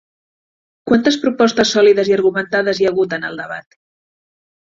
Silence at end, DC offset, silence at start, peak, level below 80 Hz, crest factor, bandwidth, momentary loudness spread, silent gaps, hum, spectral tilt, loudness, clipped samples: 1.05 s; under 0.1%; 0.85 s; -2 dBFS; -56 dBFS; 14 dB; 7.6 kHz; 15 LU; none; none; -4 dB/octave; -15 LUFS; under 0.1%